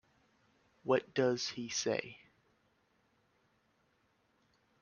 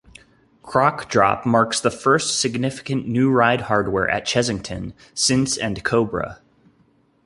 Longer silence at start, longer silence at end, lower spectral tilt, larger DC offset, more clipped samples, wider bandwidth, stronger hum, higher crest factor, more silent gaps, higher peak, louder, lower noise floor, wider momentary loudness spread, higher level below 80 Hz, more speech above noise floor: first, 0.85 s vs 0.65 s; first, 2.65 s vs 0.9 s; about the same, -3.5 dB/octave vs -4 dB/octave; neither; neither; second, 7.2 kHz vs 11.5 kHz; neither; about the same, 24 dB vs 20 dB; neither; second, -16 dBFS vs -2 dBFS; second, -35 LUFS vs -20 LUFS; first, -75 dBFS vs -59 dBFS; about the same, 10 LU vs 9 LU; second, -80 dBFS vs -48 dBFS; about the same, 41 dB vs 39 dB